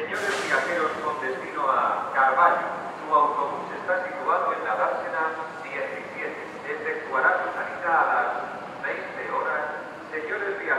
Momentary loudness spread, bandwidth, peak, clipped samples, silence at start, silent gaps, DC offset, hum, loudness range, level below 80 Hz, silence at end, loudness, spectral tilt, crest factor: 11 LU; 14 kHz; -6 dBFS; under 0.1%; 0 s; none; under 0.1%; none; 4 LU; -72 dBFS; 0 s; -26 LUFS; -3.5 dB/octave; 20 dB